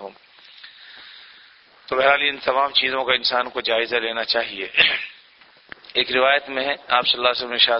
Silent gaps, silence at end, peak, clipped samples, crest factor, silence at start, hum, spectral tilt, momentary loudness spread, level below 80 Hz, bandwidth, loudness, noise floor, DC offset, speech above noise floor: none; 0 s; 0 dBFS; under 0.1%; 22 dB; 0 s; none; -4.5 dB/octave; 12 LU; -60 dBFS; 6 kHz; -19 LUFS; -52 dBFS; under 0.1%; 31 dB